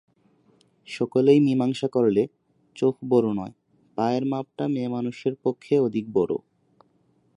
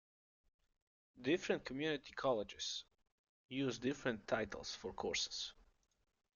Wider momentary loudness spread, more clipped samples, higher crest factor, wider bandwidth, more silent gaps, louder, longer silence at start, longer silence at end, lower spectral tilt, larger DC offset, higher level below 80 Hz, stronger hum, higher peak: first, 12 LU vs 7 LU; neither; about the same, 18 dB vs 22 dB; first, 10.5 kHz vs 7.4 kHz; second, none vs 3.12-3.49 s; first, -24 LUFS vs -42 LUFS; second, 0.9 s vs 1.15 s; first, 1 s vs 0.85 s; first, -8 dB/octave vs -3.5 dB/octave; neither; about the same, -66 dBFS vs -70 dBFS; neither; first, -6 dBFS vs -22 dBFS